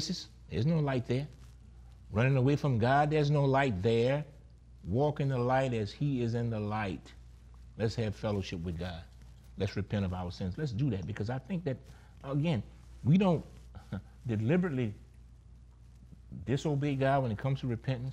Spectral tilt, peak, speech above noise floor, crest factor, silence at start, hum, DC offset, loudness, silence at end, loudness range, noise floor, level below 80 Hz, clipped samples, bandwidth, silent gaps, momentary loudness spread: -7.5 dB/octave; -16 dBFS; 24 dB; 16 dB; 0 s; none; under 0.1%; -32 LUFS; 0 s; 7 LU; -54 dBFS; -54 dBFS; under 0.1%; 9 kHz; none; 16 LU